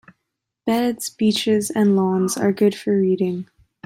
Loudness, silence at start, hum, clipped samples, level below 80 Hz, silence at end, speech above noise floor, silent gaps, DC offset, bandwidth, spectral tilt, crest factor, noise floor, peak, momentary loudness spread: -20 LUFS; 0.65 s; none; under 0.1%; -64 dBFS; 0.4 s; 60 dB; none; under 0.1%; 16 kHz; -5.5 dB/octave; 14 dB; -79 dBFS; -6 dBFS; 7 LU